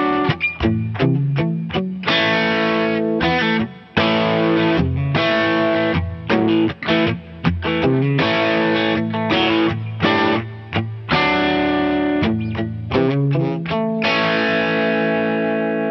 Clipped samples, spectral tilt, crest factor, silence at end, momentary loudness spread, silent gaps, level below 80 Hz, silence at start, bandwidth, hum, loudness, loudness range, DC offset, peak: under 0.1%; -7.5 dB/octave; 16 dB; 0 s; 5 LU; none; -42 dBFS; 0 s; 6.4 kHz; none; -18 LUFS; 1 LU; under 0.1%; -2 dBFS